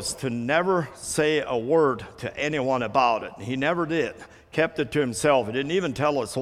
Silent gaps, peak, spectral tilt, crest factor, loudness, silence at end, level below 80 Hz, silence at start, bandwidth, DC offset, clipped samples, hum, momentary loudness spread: none; -6 dBFS; -4.5 dB/octave; 18 dB; -25 LUFS; 0 s; -56 dBFS; 0 s; 15 kHz; under 0.1%; under 0.1%; none; 7 LU